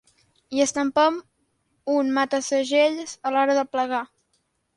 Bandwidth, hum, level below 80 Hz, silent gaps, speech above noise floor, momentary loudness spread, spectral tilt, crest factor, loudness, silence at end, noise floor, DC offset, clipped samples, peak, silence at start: 11.5 kHz; none; -70 dBFS; none; 49 dB; 9 LU; -2 dB/octave; 16 dB; -23 LUFS; 0.7 s; -71 dBFS; under 0.1%; under 0.1%; -8 dBFS; 0.5 s